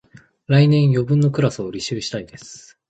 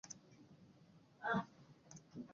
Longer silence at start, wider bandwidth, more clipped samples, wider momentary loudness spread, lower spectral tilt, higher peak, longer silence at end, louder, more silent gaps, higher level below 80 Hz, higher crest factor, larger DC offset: first, 0.5 s vs 0.05 s; first, 8.2 kHz vs 7.2 kHz; neither; second, 21 LU vs 25 LU; first, -7 dB/octave vs -4.5 dB/octave; first, -4 dBFS vs -28 dBFS; first, 0.3 s vs 0 s; first, -18 LUFS vs -45 LUFS; neither; first, -54 dBFS vs -80 dBFS; second, 16 dB vs 22 dB; neither